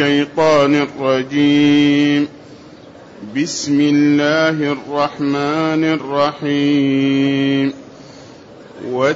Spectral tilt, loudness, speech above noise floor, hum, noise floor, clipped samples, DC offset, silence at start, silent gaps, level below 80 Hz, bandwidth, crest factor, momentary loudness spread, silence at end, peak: -5.5 dB/octave; -15 LUFS; 24 dB; none; -39 dBFS; under 0.1%; under 0.1%; 0 s; none; -58 dBFS; 8 kHz; 12 dB; 9 LU; 0 s; -4 dBFS